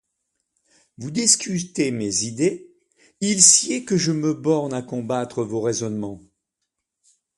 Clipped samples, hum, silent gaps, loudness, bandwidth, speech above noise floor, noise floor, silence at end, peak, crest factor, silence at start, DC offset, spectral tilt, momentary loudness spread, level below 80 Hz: under 0.1%; none; none; -20 LUFS; 13 kHz; 59 dB; -80 dBFS; 1.2 s; 0 dBFS; 24 dB; 1 s; under 0.1%; -3 dB/octave; 16 LU; -62 dBFS